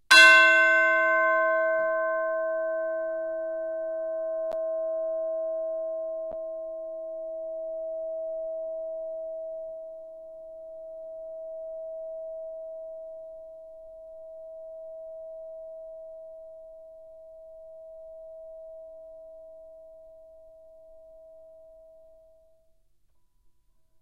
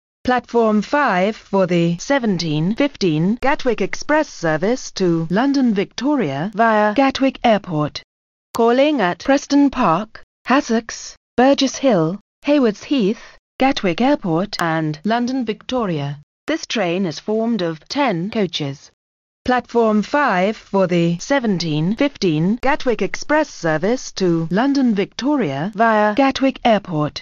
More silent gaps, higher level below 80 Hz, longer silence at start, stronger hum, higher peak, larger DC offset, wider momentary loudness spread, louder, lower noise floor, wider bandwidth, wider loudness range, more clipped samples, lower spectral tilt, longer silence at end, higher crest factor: second, none vs 8.04-8.54 s, 10.23-10.45 s, 11.17-11.37 s, 12.21-12.42 s, 13.39-13.59 s, 16.23-16.47 s, 18.93-19.45 s; second, -68 dBFS vs -46 dBFS; second, 0.1 s vs 0.25 s; neither; about the same, -2 dBFS vs -2 dBFS; neither; first, 24 LU vs 7 LU; second, -25 LUFS vs -18 LUFS; second, -68 dBFS vs under -90 dBFS; first, 15.5 kHz vs 7.6 kHz; first, 20 LU vs 4 LU; neither; second, 0 dB/octave vs -4.5 dB/octave; first, 2.3 s vs 0 s; first, 26 dB vs 16 dB